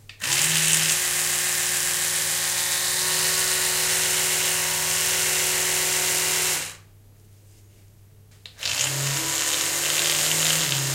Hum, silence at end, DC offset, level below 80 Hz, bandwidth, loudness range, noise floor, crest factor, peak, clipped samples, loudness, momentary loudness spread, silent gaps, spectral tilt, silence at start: none; 0 s; under 0.1%; -56 dBFS; 16.5 kHz; 6 LU; -51 dBFS; 24 dB; 0 dBFS; under 0.1%; -20 LUFS; 4 LU; none; 0 dB/octave; 0.1 s